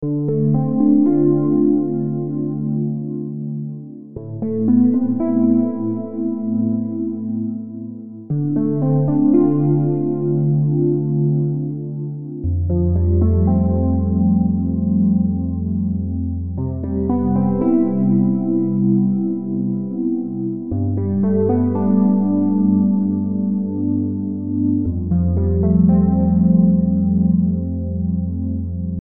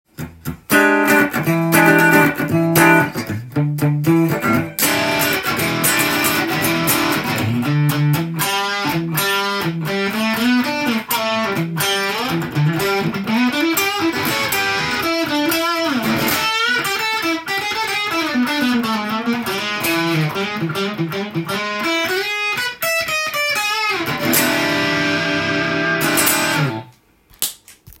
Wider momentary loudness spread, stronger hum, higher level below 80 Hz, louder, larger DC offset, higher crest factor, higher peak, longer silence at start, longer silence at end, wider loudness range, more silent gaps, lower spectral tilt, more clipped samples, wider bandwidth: about the same, 9 LU vs 7 LU; neither; first, -36 dBFS vs -52 dBFS; about the same, -18 LUFS vs -17 LUFS; first, 0.8% vs under 0.1%; about the same, 14 dB vs 18 dB; second, -4 dBFS vs 0 dBFS; second, 0 s vs 0.2 s; about the same, 0 s vs 0.1 s; about the same, 4 LU vs 4 LU; neither; first, -15.5 dB/octave vs -4 dB/octave; neither; second, 2.1 kHz vs 17 kHz